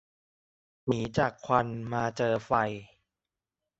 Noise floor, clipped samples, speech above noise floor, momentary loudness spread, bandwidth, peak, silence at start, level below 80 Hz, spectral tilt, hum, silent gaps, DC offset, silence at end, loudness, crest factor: -90 dBFS; under 0.1%; 61 dB; 6 LU; 8.2 kHz; -8 dBFS; 0.85 s; -58 dBFS; -6.5 dB/octave; none; none; under 0.1%; 0.95 s; -30 LUFS; 24 dB